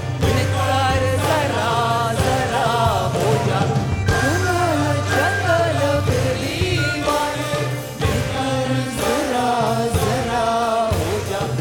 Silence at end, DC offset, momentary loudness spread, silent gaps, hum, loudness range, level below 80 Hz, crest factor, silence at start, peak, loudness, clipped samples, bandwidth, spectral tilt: 0 s; under 0.1%; 4 LU; none; none; 2 LU; -36 dBFS; 16 dB; 0 s; -4 dBFS; -19 LUFS; under 0.1%; 19 kHz; -5 dB/octave